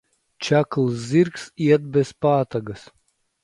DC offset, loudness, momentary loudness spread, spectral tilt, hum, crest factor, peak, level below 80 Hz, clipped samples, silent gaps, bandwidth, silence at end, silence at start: under 0.1%; -21 LUFS; 11 LU; -7 dB/octave; none; 18 dB; -4 dBFS; -60 dBFS; under 0.1%; none; 11.5 kHz; 0.65 s; 0.4 s